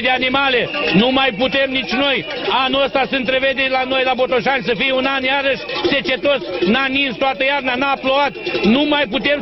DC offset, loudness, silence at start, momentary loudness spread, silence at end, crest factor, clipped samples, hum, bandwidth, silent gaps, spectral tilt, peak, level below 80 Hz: under 0.1%; -16 LUFS; 0 s; 3 LU; 0 s; 14 dB; under 0.1%; none; 6.2 kHz; none; -6 dB/octave; -2 dBFS; -46 dBFS